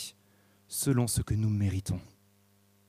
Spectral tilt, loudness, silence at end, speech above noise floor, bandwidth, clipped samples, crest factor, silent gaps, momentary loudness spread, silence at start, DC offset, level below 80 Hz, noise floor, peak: -5.5 dB/octave; -31 LUFS; 0.8 s; 37 dB; 15.5 kHz; under 0.1%; 18 dB; none; 10 LU; 0 s; under 0.1%; -50 dBFS; -66 dBFS; -14 dBFS